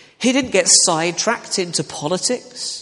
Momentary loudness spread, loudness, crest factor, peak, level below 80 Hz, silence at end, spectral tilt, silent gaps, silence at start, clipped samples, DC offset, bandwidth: 11 LU; -17 LUFS; 18 dB; 0 dBFS; -58 dBFS; 0 s; -2 dB/octave; none; 0.2 s; under 0.1%; under 0.1%; 11.5 kHz